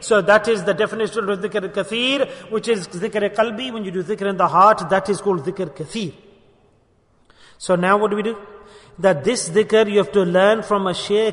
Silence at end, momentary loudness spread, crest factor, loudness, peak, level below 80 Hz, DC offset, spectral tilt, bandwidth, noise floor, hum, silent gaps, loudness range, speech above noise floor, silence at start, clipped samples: 0 s; 12 LU; 18 dB; -19 LUFS; -2 dBFS; -58 dBFS; under 0.1%; -4.5 dB/octave; 11 kHz; -58 dBFS; none; none; 5 LU; 40 dB; 0 s; under 0.1%